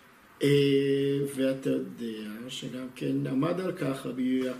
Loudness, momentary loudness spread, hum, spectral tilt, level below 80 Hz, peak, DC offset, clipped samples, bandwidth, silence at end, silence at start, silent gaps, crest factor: -29 LUFS; 13 LU; none; -6.5 dB/octave; -68 dBFS; -12 dBFS; under 0.1%; under 0.1%; 15 kHz; 0 s; 0.4 s; none; 16 dB